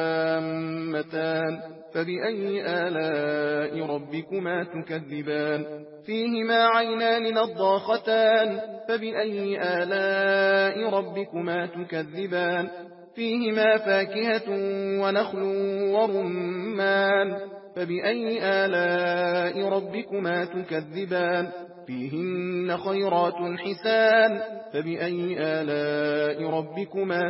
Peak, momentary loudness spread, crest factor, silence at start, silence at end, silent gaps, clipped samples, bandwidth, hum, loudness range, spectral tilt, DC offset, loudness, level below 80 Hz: -10 dBFS; 11 LU; 16 dB; 0 s; 0 s; none; under 0.1%; 5.8 kHz; none; 5 LU; -9.5 dB/octave; under 0.1%; -26 LUFS; -80 dBFS